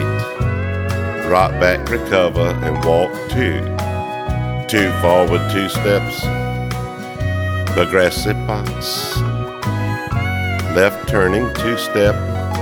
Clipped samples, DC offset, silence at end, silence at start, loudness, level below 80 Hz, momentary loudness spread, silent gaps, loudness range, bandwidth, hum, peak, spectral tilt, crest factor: under 0.1%; under 0.1%; 0 s; 0 s; -18 LUFS; -32 dBFS; 7 LU; none; 2 LU; 19 kHz; none; 0 dBFS; -5.5 dB/octave; 16 dB